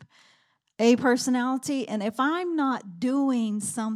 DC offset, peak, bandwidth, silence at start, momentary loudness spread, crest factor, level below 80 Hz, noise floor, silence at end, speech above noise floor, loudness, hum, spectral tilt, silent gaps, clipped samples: under 0.1%; -8 dBFS; 14.5 kHz; 0 s; 7 LU; 18 dB; -78 dBFS; -66 dBFS; 0 s; 41 dB; -25 LUFS; none; -4 dB/octave; none; under 0.1%